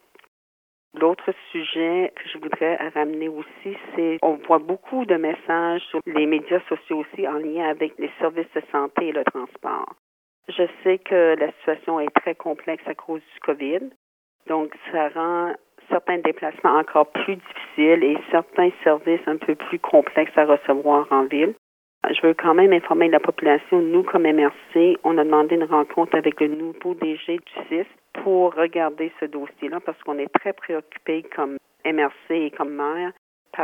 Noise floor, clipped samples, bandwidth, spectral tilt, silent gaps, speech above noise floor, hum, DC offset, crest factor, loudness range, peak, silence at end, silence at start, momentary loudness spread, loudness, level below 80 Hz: under -90 dBFS; under 0.1%; 3.8 kHz; -7 dB/octave; 9.99-10.42 s, 13.96-14.39 s, 21.58-22.01 s, 33.18-33.45 s; over 69 dB; none; under 0.1%; 20 dB; 8 LU; -2 dBFS; 0 s; 0.95 s; 12 LU; -22 LUFS; -80 dBFS